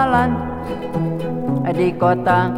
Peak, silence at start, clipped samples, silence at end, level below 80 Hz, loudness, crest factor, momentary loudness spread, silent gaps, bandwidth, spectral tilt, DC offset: -2 dBFS; 0 s; under 0.1%; 0 s; -40 dBFS; -19 LUFS; 16 dB; 8 LU; none; 14.5 kHz; -8 dB/octave; under 0.1%